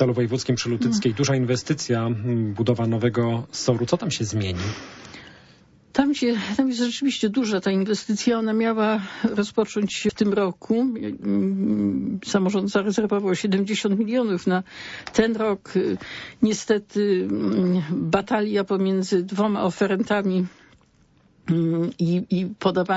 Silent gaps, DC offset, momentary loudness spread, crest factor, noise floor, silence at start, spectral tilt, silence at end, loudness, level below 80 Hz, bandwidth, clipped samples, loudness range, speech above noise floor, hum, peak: none; under 0.1%; 4 LU; 16 dB; -58 dBFS; 0 s; -6 dB/octave; 0 s; -23 LUFS; -56 dBFS; 8 kHz; under 0.1%; 2 LU; 36 dB; none; -6 dBFS